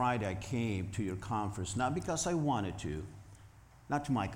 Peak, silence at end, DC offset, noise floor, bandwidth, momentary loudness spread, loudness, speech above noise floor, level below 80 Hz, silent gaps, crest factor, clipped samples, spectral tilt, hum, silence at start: -20 dBFS; 0 s; under 0.1%; -57 dBFS; 16.5 kHz; 9 LU; -36 LUFS; 23 dB; -56 dBFS; none; 14 dB; under 0.1%; -5.5 dB/octave; none; 0 s